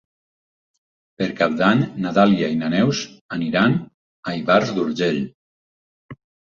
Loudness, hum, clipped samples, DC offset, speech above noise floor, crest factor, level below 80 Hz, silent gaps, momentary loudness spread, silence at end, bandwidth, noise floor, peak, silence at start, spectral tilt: -20 LUFS; none; under 0.1%; under 0.1%; over 71 dB; 20 dB; -58 dBFS; 3.21-3.29 s, 3.94-4.23 s, 5.34-6.09 s; 10 LU; 0.4 s; 7.4 kHz; under -90 dBFS; -2 dBFS; 1.2 s; -6 dB/octave